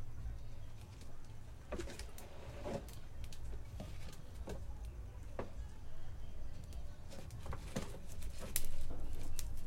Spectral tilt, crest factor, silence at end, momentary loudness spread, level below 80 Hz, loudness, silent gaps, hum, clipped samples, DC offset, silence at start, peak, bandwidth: -4.5 dB/octave; 28 dB; 0 s; 8 LU; -46 dBFS; -49 LUFS; none; none; under 0.1%; under 0.1%; 0 s; -12 dBFS; 16.5 kHz